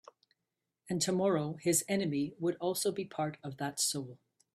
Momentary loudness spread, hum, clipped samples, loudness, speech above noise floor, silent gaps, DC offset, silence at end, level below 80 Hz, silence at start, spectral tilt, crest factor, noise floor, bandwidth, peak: 9 LU; none; under 0.1%; -33 LUFS; 54 dB; none; under 0.1%; 0.4 s; -76 dBFS; 0.85 s; -4 dB/octave; 18 dB; -88 dBFS; 15.5 kHz; -16 dBFS